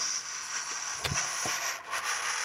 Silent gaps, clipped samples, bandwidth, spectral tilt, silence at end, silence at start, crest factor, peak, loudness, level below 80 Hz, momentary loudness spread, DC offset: none; under 0.1%; 16 kHz; 0 dB/octave; 0 s; 0 s; 22 dB; -12 dBFS; -31 LUFS; -58 dBFS; 4 LU; under 0.1%